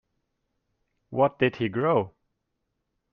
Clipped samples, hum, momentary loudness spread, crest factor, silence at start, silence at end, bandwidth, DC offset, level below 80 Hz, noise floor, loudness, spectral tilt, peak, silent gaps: under 0.1%; none; 10 LU; 20 dB; 1.1 s; 1.05 s; 6.2 kHz; under 0.1%; -66 dBFS; -79 dBFS; -25 LUFS; -9 dB/octave; -8 dBFS; none